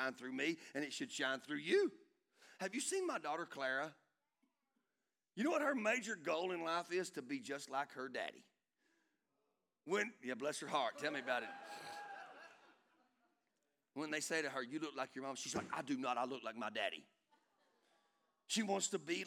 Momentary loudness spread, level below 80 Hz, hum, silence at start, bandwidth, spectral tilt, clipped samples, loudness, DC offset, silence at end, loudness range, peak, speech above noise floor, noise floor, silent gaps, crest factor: 13 LU; under -90 dBFS; none; 0 s; 16.5 kHz; -3 dB/octave; under 0.1%; -42 LUFS; under 0.1%; 0 s; 5 LU; -24 dBFS; over 48 dB; under -90 dBFS; none; 20 dB